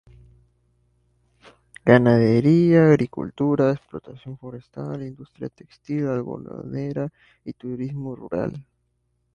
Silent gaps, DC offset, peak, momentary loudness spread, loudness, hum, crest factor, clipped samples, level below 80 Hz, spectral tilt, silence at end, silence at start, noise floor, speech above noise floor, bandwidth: none; under 0.1%; 0 dBFS; 22 LU; -21 LUFS; 60 Hz at -50 dBFS; 22 dB; under 0.1%; -56 dBFS; -9 dB/octave; 0.75 s; 1.85 s; -70 dBFS; 49 dB; 10.5 kHz